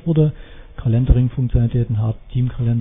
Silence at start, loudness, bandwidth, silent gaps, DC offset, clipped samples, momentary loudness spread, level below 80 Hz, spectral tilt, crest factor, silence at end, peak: 0.05 s; -19 LUFS; 3.8 kHz; none; under 0.1%; under 0.1%; 6 LU; -24 dBFS; -13 dB/octave; 16 dB; 0 s; -2 dBFS